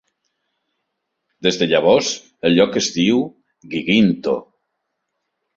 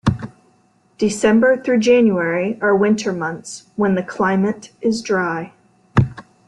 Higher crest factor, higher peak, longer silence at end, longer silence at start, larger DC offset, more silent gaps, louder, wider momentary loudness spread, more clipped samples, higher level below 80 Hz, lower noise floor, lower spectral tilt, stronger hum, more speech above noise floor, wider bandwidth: about the same, 18 dB vs 16 dB; about the same, -2 dBFS vs -2 dBFS; first, 1.15 s vs 0.25 s; first, 1.4 s vs 0.05 s; neither; neither; about the same, -17 LUFS vs -18 LUFS; second, 10 LU vs 13 LU; neither; second, -58 dBFS vs -44 dBFS; first, -76 dBFS vs -57 dBFS; second, -4.5 dB/octave vs -6 dB/octave; neither; first, 59 dB vs 40 dB; second, 7.8 kHz vs 11.5 kHz